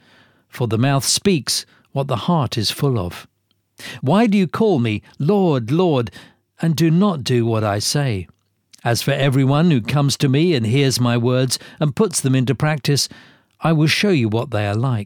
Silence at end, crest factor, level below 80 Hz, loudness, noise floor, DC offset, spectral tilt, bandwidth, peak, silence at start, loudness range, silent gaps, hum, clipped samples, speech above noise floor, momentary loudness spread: 0 s; 14 dB; -54 dBFS; -18 LUFS; -54 dBFS; under 0.1%; -5.5 dB/octave; 19.5 kHz; -4 dBFS; 0.55 s; 3 LU; none; none; under 0.1%; 37 dB; 8 LU